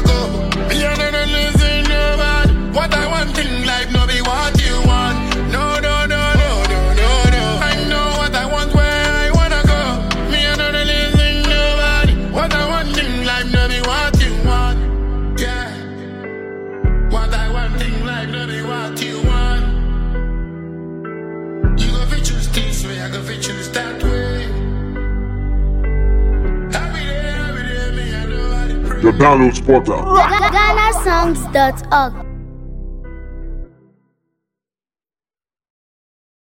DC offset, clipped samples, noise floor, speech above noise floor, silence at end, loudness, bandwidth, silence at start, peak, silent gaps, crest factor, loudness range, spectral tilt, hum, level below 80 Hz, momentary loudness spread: under 0.1%; under 0.1%; under -90 dBFS; over 78 dB; 2.85 s; -16 LUFS; 15.5 kHz; 0 s; 0 dBFS; none; 16 dB; 8 LU; -5 dB/octave; none; -18 dBFS; 12 LU